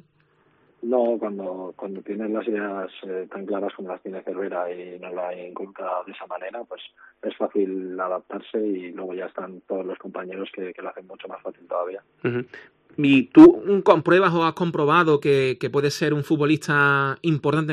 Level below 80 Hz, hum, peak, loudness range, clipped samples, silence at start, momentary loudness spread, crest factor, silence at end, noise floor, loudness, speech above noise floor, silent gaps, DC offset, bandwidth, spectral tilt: -62 dBFS; none; -2 dBFS; 15 LU; under 0.1%; 0.85 s; 17 LU; 20 dB; 0 s; -62 dBFS; -22 LUFS; 40 dB; none; under 0.1%; 10.5 kHz; -7 dB/octave